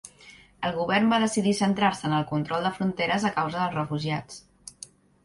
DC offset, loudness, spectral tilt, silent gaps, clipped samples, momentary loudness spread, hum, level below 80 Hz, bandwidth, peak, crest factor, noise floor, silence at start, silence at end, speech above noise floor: under 0.1%; -26 LUFS; -5 dB/octave; none; under 0.1%; 21 LU; none; -60 dBFS; 11.5 kHz; -10 dBFS; 18 dB; -52 dBFS; 0.05 s; 0.55 s; 27 dB